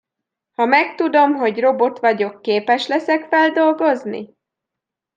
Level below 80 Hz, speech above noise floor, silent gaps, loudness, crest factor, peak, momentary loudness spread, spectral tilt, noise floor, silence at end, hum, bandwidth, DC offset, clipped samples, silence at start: -76 dBFS; 67 dB; none; -17 LUFS; 16 dB; -2 dBFS; 7 LU; -5 dB/octave; -84 dBFS; 0.9 s; none; 7.6 kHz; under 0.1%; under 0.1%; 0.6 s